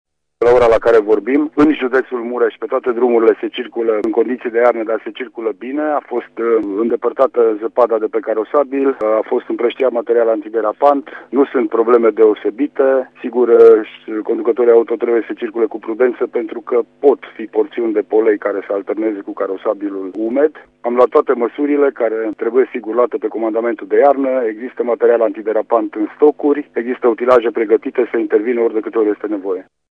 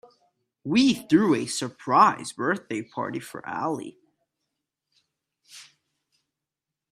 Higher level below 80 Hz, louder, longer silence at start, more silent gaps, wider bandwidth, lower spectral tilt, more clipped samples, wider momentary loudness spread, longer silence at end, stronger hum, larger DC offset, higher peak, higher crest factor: first, -52 dBFS vs -70 dBFS; first, -15 LUFS vs -24 LUFS; second, 0.4 s vs 0.65 s; neither; second, 5.2 kHz vs 14.5 kHz; first, -7 dB/octave vs -4.5 dB/octave; neither; second, 9 LU vs 15 LU; second, 0.3 s vs 1.3 s; neither; neither; first, 0 dBFS vs -6 dBFS; second, 14 dB vs 22 dB